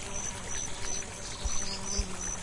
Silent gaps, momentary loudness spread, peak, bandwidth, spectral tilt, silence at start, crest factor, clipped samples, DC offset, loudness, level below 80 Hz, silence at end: none; 3 LU; -18 dBFS; 11.5 kHz; -2 dB/octave; 0 s; 16 dB; under 0.1%; under 0.1%; -35 LUFS; -40 dBFS; 0 s